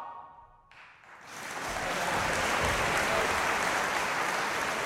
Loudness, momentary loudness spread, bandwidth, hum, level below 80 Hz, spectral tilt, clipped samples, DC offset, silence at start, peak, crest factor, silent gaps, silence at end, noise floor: -29 LUFS; 15 LU; 16 kHz; none; -50 dBFS; -2.5 dB/octave; under 0.1%; under 0.1%; 0 s; -14 dBFS; 16 dB; none; 0 s; -55 dBFS